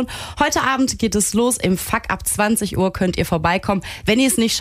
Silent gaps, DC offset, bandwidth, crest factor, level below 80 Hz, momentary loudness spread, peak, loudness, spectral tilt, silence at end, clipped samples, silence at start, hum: none; under 0.1%; 16 kHz; 16 dB; -38 dBFS; 5 LU; -2 dBFS; -18 LUFS; -4 dB/octave; 0 s; under 0.1%; 0 s; none